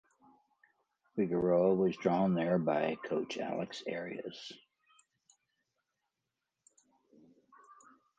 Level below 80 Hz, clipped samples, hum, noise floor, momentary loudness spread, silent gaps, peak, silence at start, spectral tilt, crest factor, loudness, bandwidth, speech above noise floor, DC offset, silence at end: -72 dBFS; under 0.1%; none; -88 dBFS; 15 LU; none; -16 dBFS; 1.15 s; -7 dB/octave; 20 dB; -33 LUFS; 8 kHz; 56 dB; under 0.1%; 3.6 s